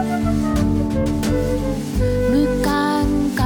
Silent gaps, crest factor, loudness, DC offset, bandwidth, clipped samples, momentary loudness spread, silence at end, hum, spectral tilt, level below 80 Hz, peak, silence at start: none; 12 dB; -19 LUFS; under 0.1%; 19 kHz; under 0.1%; 4 LU; 0 s; none; -6.5 dB/octave; -28 dBFS; -6 dBFS; 0 s